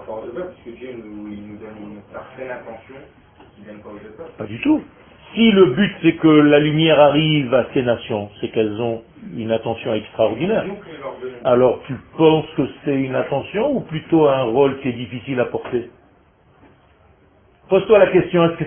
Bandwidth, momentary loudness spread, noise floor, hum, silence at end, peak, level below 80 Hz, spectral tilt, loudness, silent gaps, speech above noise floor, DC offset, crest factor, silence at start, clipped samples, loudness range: 3.5 kHz; 22 LU; -54 dBFS; none; 0 s; 0 dBFS; -52 dBFS; -11.5 dB/octave; -17 LUFS; none; 35 dB; under 0.1%; 18 dB; 0 s; under 0.1%; 18 LU